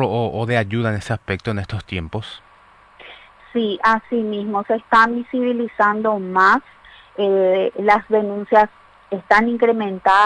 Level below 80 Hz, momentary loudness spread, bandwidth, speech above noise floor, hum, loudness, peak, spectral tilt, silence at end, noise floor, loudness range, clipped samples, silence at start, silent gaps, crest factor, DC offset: -50 dBFS; 12 LU; 10.5 kHz; 31 dB; none; -18 LUFS; -2 dBFS; -6.5 dB/octave; 0 s; -49 dBFS; 7 LU; under 0.1%; 0 s; none; 16 dB; under 0.1%